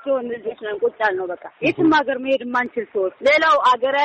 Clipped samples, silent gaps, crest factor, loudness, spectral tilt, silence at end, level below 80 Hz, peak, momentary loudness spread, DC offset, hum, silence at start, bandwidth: under 0.1%; none; 12 dB; -19 LUFS; -5 dB/octave; 0 s; -60 dBFS; -6 dBFS; 12 LU; under 0.1%; none; 0.05 s; 8.4 kHz